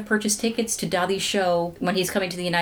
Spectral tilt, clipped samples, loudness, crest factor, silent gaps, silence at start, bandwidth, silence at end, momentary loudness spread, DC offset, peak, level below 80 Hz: -3.5 dB/octave; under 0.1%; -23 LUFS; 14 dB; none; 0 s; over 20 kHz; 0 s; 3 LU; under 0.1%; -8 dBFS; -56 dBFS